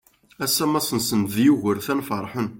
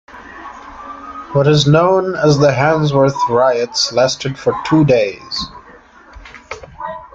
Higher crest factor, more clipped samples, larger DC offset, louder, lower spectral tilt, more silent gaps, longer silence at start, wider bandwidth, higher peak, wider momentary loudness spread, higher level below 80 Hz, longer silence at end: about the same, 16 dB vs 14 dB; neither; neither; second, -22 LUFS vs -14 LUFS; second, -4 dB/octave vs -5.5 dB/octave; neither; first, 0.4 s vs 0.15 s; first, 17 kHz vs 7.8 kHz; second, -6 dBFS vs 0 dBFS; second, 8 LU vs 20 LU; second, -60 dBFS vs -44 dBFS; about the same, 0 s vs 0.1 s